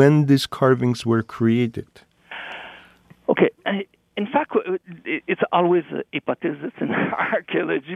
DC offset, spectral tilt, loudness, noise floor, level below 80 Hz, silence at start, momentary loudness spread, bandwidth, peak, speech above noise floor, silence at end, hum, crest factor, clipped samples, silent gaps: under 0.1%; -7 dB/octave; -22 LUFS; -51 dBFS; -62 dBFS; 0 s; 15 LU; 14 kHz; -2 dBFS; 30 dB; 0 s; none; 18 dB; under 0.1%; none